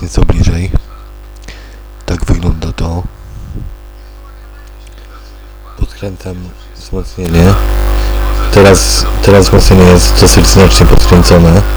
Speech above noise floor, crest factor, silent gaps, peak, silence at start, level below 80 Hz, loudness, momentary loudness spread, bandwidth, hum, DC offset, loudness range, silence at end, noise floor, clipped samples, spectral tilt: 24 dB; 8 dB; none; 0 dBFS; 0 s; -14 dBFS; -8 LUFS; 22 LU; over 20 kHz; 50 Hz at -30 dBFS; under 0.1%; 21 LU; 0 s; -30 dBFS; 7%; -5 dB/octave